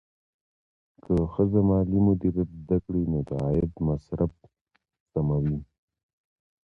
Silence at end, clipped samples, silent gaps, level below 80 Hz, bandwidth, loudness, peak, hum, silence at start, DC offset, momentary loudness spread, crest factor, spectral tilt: 1.05 s; under 0.1%; 4.61-4.66 s, 5.00-5.06 s; -42 dBFS; 5 kHz; -26 LUFS; -10 dBFS; none; 1.1 s; under 0.1%; 8 LU; 16 dB; -12 dB/octave